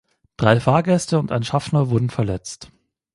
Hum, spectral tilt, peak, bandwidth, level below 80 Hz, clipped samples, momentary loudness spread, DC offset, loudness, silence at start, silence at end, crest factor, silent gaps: none; -6.5 dB/octave; 0 dBFS; 11.5 kHz; -46 dBFS; under 0.1%; 11 LU; under 0.1%; -20 LUFS; 0.4 s; 0.5 s; 20 dB; none